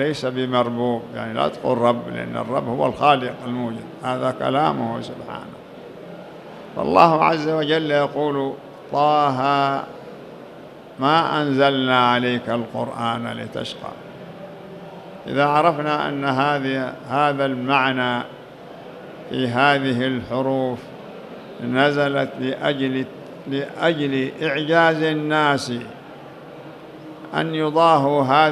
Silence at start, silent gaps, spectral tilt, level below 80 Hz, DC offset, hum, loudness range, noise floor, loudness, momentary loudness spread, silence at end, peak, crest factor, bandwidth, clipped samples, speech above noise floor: 0 s; none; -6 dB/octave; -62 dBFS; under 0.1%; none; 4 LU; -40 dBFS; -20 LUFS; 21 LU; 0 s; 0 dBFS; 22 dB; 13.5 kHz; under 0.1%; 20 dB